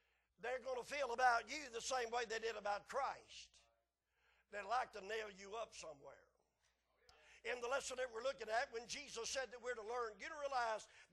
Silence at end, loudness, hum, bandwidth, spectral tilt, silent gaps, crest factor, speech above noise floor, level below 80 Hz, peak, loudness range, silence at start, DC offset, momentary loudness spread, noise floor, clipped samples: 0.05 s; -44 LUFS; none; 12 kHz; -1 dB/octave; none; 22 dB; 41 dB; -76 dBFS; -24 dBFS; 7 LU; 0.4 s; under 0.1%; 11 LU; -86 dBFS; under 0.1%